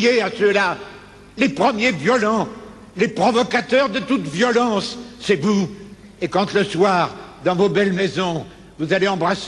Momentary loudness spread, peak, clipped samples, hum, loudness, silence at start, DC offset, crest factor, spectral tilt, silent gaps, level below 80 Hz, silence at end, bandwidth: 12 LU; -4 dBFS; under 0.1%; none; -19 LUFS; 0 s; under 0.1%; 16 dB; -5 dB/octave; none; -54 dBFS; 0 s; 11 kHz